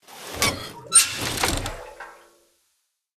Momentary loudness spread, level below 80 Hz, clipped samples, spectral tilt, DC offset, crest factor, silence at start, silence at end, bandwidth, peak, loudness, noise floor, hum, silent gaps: 24 LU; -42 dBFS; under 0.1%; -1 dB/octave; under 0.1%; 24 dB; 0.1 s; 1 s; 15 kHz; -2 dBFS; -20 LUFS; -73 dBFS; none; none